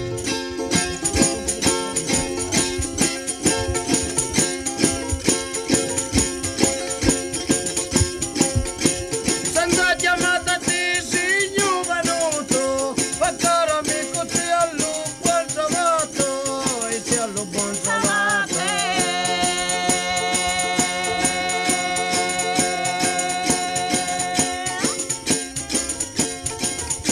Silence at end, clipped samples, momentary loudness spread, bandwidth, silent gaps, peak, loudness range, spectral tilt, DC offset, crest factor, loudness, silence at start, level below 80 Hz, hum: 0 s; under 0.1%; 4 LU; 16.5 kHz; none; 0 dBFS; 2 LU; -2.5 dB/octave; under 0.1%; 20 dB; -20 LUFS; 0 s; -40 dBFS; none